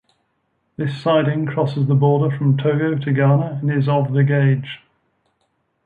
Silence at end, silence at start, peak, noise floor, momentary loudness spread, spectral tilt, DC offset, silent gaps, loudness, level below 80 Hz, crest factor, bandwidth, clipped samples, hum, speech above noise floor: 1.1 s; 0.8 s; -4 dBFS; -68 dBFS; 9 LU; -10 dB/octave; under 0.1%; none; -18 LUFS; -60 dBFS; 14 dB; 4.7 kHz; under 0.1%; none; 51 dB